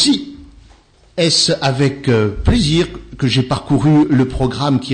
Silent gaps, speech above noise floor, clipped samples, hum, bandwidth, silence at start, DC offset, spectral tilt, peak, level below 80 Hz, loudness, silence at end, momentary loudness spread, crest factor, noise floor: none; 33 dB; under 0.1%; none; 9.6 kHz; 0 s; under 0.1%; -5 dB/octave; -4 dBFS; -30 dBFS; -15 LUFS; 0 s; 8 LU; 12 dB; -47 dBFS